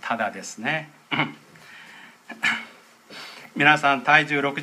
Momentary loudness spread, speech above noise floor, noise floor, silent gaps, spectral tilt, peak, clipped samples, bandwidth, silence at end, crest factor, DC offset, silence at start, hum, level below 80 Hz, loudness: 25 LU; 26 dB; -48 dBFS; none; -4 dB/octave; 0 dBFS; under 0.1%; 15 kHz; 0 s; 24 dB; under 0.1%; 0.05 s; none; -76 dBFS; -22 LUFS